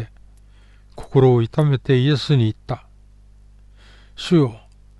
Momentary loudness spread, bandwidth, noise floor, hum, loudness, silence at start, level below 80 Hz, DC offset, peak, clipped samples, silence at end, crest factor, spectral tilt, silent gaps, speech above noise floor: 16 LU; 11 kHz; -47 dBFS; 50 Hz at -40 dBFS; -18 LUFS; 0 s; -46 dBFS; under 0.1%; -4 dBFS; under 0.1%; 0.45 s; 16 dB; -8 dB/octave; none; 31 dB